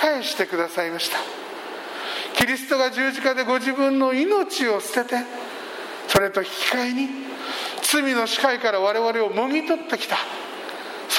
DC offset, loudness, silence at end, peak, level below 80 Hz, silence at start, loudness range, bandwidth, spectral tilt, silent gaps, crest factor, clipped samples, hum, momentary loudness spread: under 0.1%; -23 LUFS; 0 s; -2 dBFS; -58 dBFS; 0 s; 2 LU; 16.5 kHz; -2.5 dB/octave; none; 22 dB; under 0.1%; none; 12 LU